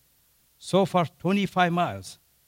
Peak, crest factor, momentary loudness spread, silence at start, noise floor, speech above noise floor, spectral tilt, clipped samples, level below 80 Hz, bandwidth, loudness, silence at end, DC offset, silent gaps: -10 dBFS; 16 dB; 17 LU; 0.6 s; -64 dBFS; 40 dB; -6 dB/octave; under 0.1%; -64 dBFS; 16 kHz; -25 LUFS; 0.35 s; under 0.1%; none